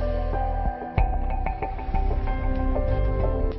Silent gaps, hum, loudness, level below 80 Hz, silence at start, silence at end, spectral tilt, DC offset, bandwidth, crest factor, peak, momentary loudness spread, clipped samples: none; none; -27 LUFS; -26 dBFS; 0 s; 0 s; -11 dB/octave; under 0.1%; 4.9 kHz; 18 dB; -6 dBFS; 4 LU; under 0.1%